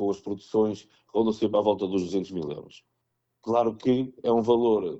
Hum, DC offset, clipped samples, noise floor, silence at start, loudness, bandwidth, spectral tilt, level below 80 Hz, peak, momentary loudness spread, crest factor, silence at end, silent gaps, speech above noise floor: none; under 0.1%; under 0.1%; -78 dBFS; 0 s; -26 LUFS; 8 kHz; -7.5 dB/octave; -62 dBFS; -10 dBFS; 12 LU; 16 dB; 0 s; none; 52 dB